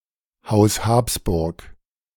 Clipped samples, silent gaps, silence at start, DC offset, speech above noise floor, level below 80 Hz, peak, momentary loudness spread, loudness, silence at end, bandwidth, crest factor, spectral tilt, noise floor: under 0.1%; none; 0.45 s; under 0.1%; 25 dB; -36 dBFS; -4 dBFS; 10 LU; -20 LUFS; 0.45 s; 19 kHz; 18 dB; -5.5 dB/octave; -44 dBFS